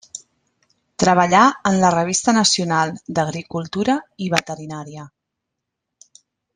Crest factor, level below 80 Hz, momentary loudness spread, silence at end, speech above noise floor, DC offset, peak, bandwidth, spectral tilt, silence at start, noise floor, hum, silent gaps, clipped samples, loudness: 20 dB; -56 dBFS; 20 LU; 1.5 s; 62 dB; under 0.1%; 0 dBFS; 10.5 kHz; -4 dB/octave; 0.15 s; -80 dBFS; none; none; under 0.1%; -18 LUFS